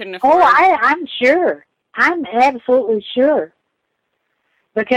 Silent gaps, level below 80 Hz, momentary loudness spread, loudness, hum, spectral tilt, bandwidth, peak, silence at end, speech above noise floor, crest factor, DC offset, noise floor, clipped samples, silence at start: none; -58 dBFS; 14 LU; -14 LUFS; none; -4.5 dB/octave; 11.5 kHz; -2 dBFS; 0 s; 57 dB; 14 dB; under 0.1%; -71 dBFS; under 0.1%; 0 s